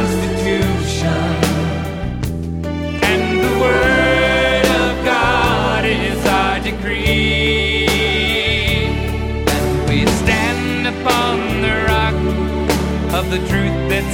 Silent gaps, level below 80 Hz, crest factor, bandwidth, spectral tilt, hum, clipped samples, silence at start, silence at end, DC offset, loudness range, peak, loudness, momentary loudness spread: none; -26 dBFS; 16 dB; 19.5 kHz; -5 dB/octave; none; under 0.1%; 0 s; 0 s; under 0.1%; 3 LU; 0 dBFS; -16 LUFS; 7 LU